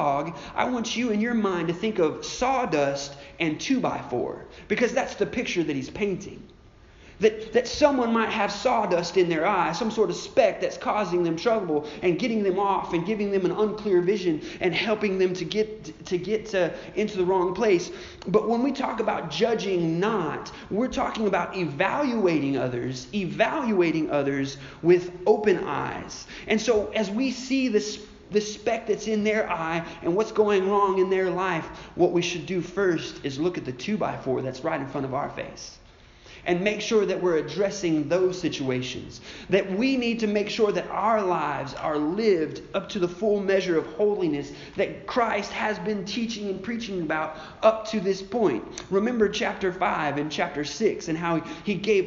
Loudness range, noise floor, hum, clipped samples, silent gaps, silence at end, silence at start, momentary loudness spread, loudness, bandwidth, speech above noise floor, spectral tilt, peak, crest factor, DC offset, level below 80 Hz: 3 LU; -51 dBFS; none; under 0.1%; none; 0 s; 0 s; 8 LU; -25 LUFS; 7.4 kHz; 26 dB; -4 dB/octave; -6 dBFS; 20 dB; under 0.1%; -54 dBFS